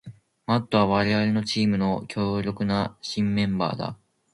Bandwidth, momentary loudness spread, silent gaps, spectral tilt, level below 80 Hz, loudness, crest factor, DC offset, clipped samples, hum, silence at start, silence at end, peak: 11.5 kHz; 7 LU; none; -6.5 dB/octave; -52 dBFS; -25 LUFS; 18 dB; under 0.1%; under 0.1%; none; 0.05 s; 0.4 s; -6 dBFS